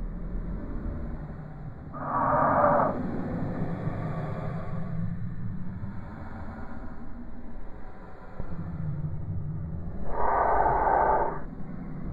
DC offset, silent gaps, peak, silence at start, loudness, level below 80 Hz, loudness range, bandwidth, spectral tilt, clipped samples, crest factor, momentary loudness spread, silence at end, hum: under 0.1%; none; -10 dBFS; 0 s; -30 LUFS; -40 dBFS; 12 LU; 4.6 kHz; -10.5 dB/octave; under 0.1%; 18 dB; 20 LU; 0 s; none